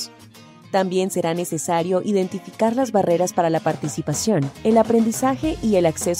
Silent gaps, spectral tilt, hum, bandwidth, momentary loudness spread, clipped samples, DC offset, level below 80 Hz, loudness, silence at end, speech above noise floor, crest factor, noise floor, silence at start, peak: none; -5.5 dB/octave; none; 16 kHz; 6 LU; under 0.1%; under 0.1%; -48 dBFS; -20 LUFS; 0 s; 25 dB; 16 dB; -45 dBFS; 0 s; -4 dBFS